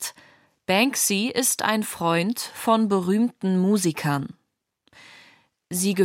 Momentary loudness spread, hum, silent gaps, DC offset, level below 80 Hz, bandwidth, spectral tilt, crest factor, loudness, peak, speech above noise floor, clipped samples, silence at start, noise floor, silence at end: 8 LU; none; none; under 0.1%; -70 dBFS; 16.5 kHz; -4 dB/octave; 18 dB; -23 LUFS; -6 dBFS; 47 dB; under 0.1%; 0 s; -69 dBFS; 0 s